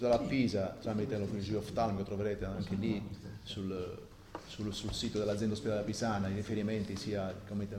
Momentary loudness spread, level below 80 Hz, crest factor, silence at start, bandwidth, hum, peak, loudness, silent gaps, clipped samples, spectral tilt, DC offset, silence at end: 10 LU; -54 dBFS; 18 dB; 0 s; 15.5 kHz; none; -18 dBFS; -36 LUFS; none; under 0.1%; -6 dB/octave; under 0.1%; 0 s